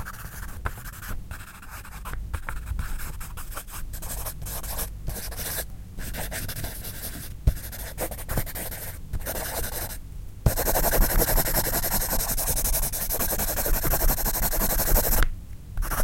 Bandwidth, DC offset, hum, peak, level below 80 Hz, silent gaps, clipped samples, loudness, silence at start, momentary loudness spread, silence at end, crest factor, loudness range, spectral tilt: 17 kHz; under 0.1%; none; -4 dBFS; -30 dBFS; none; under 0.1%; -27 LUFS; 0 s; 16 LU; 0 s; 22 dB; 12 LU; -3.5 dB/octave